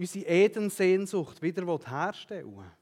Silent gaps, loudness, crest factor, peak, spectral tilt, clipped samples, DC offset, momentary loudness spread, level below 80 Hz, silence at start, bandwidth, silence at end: none; -28 LUFS; 18 dB; -12 dBFS; -5.5 dB/octave; under 0.1%; under 0.1%; 17 LU; -78 dBFS; 0 s; 15.5 kHz; 0.1 s